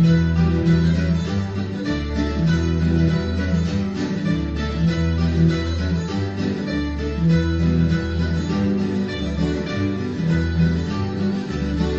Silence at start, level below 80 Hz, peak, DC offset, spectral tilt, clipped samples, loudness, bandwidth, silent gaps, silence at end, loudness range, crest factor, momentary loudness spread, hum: 0 s; -30 dBFS; -6 dBFS; under 0.1%; -7.5 dB/octave; under 0.1%; -21 LUFS; 7.6 kHz; none; 0 s; 2 LU; 14 dB; 6 LU; none